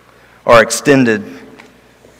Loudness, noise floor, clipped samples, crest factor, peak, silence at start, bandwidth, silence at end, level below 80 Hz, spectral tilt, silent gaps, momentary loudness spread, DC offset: -11 LUFS; -45 dBFS; 1%; 14 dB; 0 dBFS; 0.45 s; 16.5 kHz; 0.8 s; -42 dBFS; -4.5 dB/octave; none; 13 LU; under 0.1%